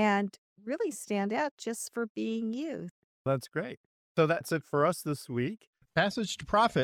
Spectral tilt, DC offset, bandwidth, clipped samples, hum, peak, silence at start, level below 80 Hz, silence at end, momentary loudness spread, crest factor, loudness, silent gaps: -5 dB/octave; under 0.1%; 17 kHz; under 0.1%; none; -12 dBFS; 0 s; -62 dBFS; 0 s; 11 LU; 20 dB; -32 LUFS; 0.38-0.56 s, 1.51-1.57 s, 2.09-2.15 s, 2.91-3.25 s, 3.77-4.15 s, 5.67-5.73 s